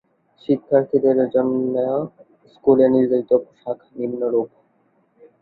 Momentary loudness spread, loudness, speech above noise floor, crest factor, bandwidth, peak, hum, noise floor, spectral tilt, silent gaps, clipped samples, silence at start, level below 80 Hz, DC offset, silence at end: 15 LU; -19 LUFS; 44 dB; 18 dB; 4.6 kHz; -2 dBFS; none; -62 dBFS; -11 dB/octave; none; under 0.1%; 0.5 s; -62 dBFS; under 0.1%; 0.95 s